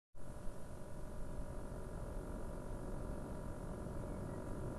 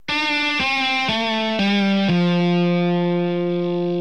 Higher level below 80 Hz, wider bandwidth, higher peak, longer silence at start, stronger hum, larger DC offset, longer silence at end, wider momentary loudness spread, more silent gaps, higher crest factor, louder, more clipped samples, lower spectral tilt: first, -50 dBFS vs -56 dBFS; first, 12.5 kHz vs 8.4 kHz; second, -30 dBFS vs -8 dBFS; about the same, 0.15 s vs 0.1 s; neither; second, under 0.1% vs 0.6%; about the same, 0 s vs 0 s; about the same, 6 LU vs 4 LU; neither; about the same, 14 dB vs 12 dB; second, -49 LUFS vs -19 LUFS; neither; about the same, -7 dB/octave vs -6 dB/octave